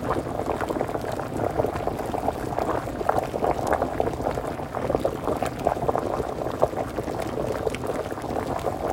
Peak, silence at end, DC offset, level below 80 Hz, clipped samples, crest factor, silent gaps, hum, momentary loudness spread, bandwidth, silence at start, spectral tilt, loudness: -4 dBFS; 0 s; under 0.1%; -42 dBFS; under 0.1%; 24 dB; none; none; 4 LU; 16.5 kHz; 0 s; -6.5 dB/octave; -27 LUFS